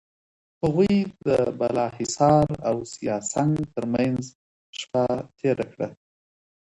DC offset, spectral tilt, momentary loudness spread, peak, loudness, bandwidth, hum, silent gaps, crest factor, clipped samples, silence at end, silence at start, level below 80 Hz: under 0.1%; -6 dB/octave; 11 LU; -6 dBFS; -24 LUFS; 11 kHz; none; 4.35-4.73 s; 18 dB; under 0.1%; 0.7 s; 0.65 s; -52 dBFS